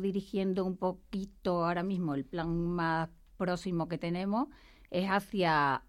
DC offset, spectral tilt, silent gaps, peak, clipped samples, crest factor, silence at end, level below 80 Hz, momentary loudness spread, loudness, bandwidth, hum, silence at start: under 0.1%; -7 dB/octave; none; -18 dBFS; under 0.1%; 16 dB; 0.05 s; -56 dBFS; 8 LU; -33 LUFS; 13.5 kHz; none; 0 s